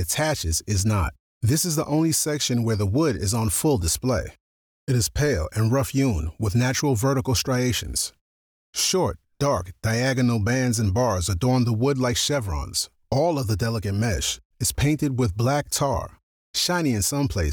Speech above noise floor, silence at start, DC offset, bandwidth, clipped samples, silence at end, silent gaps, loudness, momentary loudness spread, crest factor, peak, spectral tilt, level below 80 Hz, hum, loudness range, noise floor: over 67 dB; 0 s; under 0.1%; over 20 kHz; under 0.1%; 0 s; 1.19-1.41 s, 4.40-4.87 s, 8.21-8.73 s, 14.45-14.50 s, 16.23-16.54 s; -23 LUFS; 5 LU; 12 dB; -12 dBFS; -4.5 dB/octave; -38 dBFS; none; 2 LU; under -90 dBFS